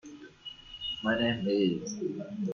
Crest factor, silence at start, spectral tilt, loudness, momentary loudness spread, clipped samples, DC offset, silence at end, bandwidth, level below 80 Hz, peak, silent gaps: 16 dB; 0.05 s; -5 dB/octave; -31 LUFS; 17 LU; under 0.1%; under 0.1%; 0 s; 7.2 kHz; -62 dBFS; -16 dBFS; none